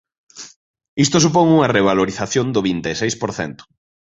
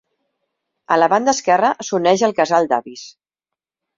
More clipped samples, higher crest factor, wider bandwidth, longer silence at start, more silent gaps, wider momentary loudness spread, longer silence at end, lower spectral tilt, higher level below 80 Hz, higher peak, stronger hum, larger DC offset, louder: neither; about the same, 18 dB vs 16 dB; about the same, 8 kHz vs 7.6 kHz; second, 0.35 s vs 0.9 s; first, 0.56-0.74 s, 0.88-0.97 s vs none; first, 22 LU vs 7 LU; second, 0.45 s vs 0.85 s; about the same, -4.5 dB/octave vs -3.5 dB/octave; first, -50 dBFS vs -64 dBFS; about the same, 0 dBFS vs -2 dBFS; neither; neither; about the same, -17 LUFS vs -16 LUFS